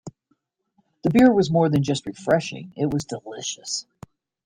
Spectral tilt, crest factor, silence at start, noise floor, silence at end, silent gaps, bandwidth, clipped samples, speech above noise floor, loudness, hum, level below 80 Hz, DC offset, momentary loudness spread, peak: -5.5 dB/octave; 18 dB; 0.05 s; -70 dBFS; 0.65 s; none; 15.5 kHz; under 0.1%; 49 dB; -22 LUFS; none; -54 dBFS; under 0.1%; 14 LU; -4 dBFS